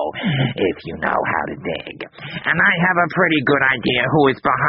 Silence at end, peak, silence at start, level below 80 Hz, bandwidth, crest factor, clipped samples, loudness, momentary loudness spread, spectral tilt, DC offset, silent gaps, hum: 0 s; -2 dBFS; 0 s; -50 dBFS; 5.4 kHz; 16 dB; under 0.1%; -17 LUFS; 12 LU; -3.5 dB/octave; under 0.1%; none; none